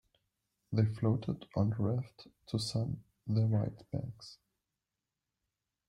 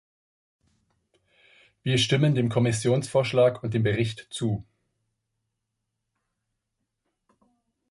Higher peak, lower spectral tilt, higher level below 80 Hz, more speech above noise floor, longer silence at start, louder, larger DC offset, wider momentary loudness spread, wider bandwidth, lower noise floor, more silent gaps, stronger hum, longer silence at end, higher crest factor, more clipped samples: second, -16 dBFS vs -8 dBFS; first, -7.5 dB/octave vs -5.5 dB/octave; second, -64 dBFS vs -58 dBFS; about the same, 56 dB vs 58 dB; second, 0.7 s vs 1.85 s; second, -35 LUFS vs -25 LUFS; neither; first, 13 LU vs 9 LU; about the same, 11.5 kHz vs 11.5 kHz; first, -90 dBFS vs -81 dBFS; neither; neither; second, 1.55 s vs 3.3 s; about the same, 20 dB vs 20 dB; neither